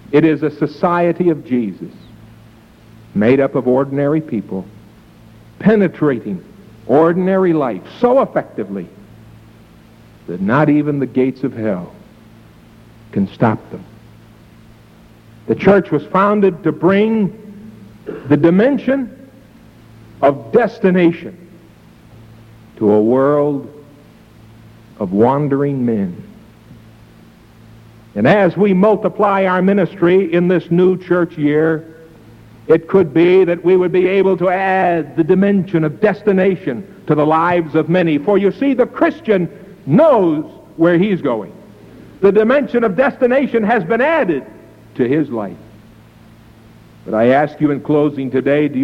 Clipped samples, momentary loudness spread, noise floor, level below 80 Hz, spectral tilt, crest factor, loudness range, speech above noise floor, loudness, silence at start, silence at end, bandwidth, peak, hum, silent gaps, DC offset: under 0.1%; 13 LU; -43 dBFS; -52 dBFS; -9 dB/octave; 14 dB; 6 LU; 30 dB; -15 LUFS; 0.1 s; 0 s; 6.4 kHz; -2 dBFS; none; none; under 0.1%